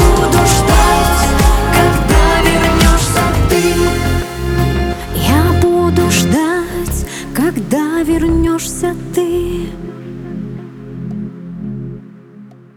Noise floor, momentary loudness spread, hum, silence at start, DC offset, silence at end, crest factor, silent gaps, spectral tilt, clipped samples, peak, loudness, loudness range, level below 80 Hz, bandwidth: -37 dBFS; 16 LU; none; 0 s; under 0.1%; 0.25 s; 12 dB; none; -5 dB/octave; under 0.1%; 0 dBFS; -13 LUFS; 10 LU; -18 dBFS; over 20 kHz